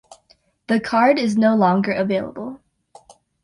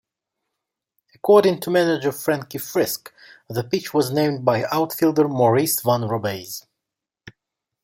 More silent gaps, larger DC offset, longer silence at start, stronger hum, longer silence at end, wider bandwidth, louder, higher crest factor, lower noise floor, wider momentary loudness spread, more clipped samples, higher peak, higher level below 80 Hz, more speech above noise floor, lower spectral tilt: neither; neither; second, 0.7 s vs 1.25 s; neither; first, 0.9 s vs 0.55 s; second, 11 kHz vs 17 kHz; about the same, -18 LUFS vs -20 LUFS; about the same, 16 dB vs 20 dB; second, -59 dBFS vs -85 dBFS; about the same, 15 LU vs 13 LU; neither; about the same, -4 dBFS vs -2 dBFS; about the same, -60 dBFS vs -64 dBFS; second, 41 dB vs 65 dB; first, -6.5 dB/octave vs -5 dB/octave